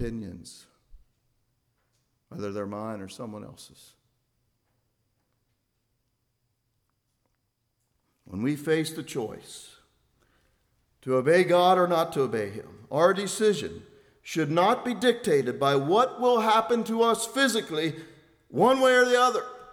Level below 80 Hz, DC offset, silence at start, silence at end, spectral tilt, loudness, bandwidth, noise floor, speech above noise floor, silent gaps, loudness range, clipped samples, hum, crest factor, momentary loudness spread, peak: -60 dBFS; under 0.1%; 0 s; 0 s; -4.5 dB/octave; -25 LUFS; 16.5 kHz; -77 dBFS; 51 dB; none; 16 LU; under 0.1%; none; 20 dB; 20 LU; -8 dBFS